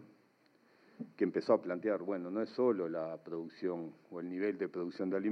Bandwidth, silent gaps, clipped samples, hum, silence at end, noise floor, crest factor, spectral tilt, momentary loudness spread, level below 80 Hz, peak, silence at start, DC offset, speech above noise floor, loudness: 6.4 kHz; none; under 0.1%; none; 0 s; -69 dBFS; 22 dB; -8 dB/octave; 12 LU; under -90 dBFS; -16 dBFS; 0 s; under 0.1%; 34 dB; -37 LUFS